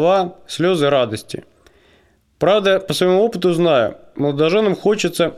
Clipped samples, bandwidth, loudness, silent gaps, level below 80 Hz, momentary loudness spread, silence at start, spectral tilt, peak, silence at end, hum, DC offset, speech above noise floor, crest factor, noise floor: under 0.1%; 15 kHz; -17 LUFS; none; -56 dBFS; 8 LU; 0 s; -5.5 dB/octave; -2 dBFS; 0 s; none; under 0.1%; 39 dB; 14 dB; -56 dBFS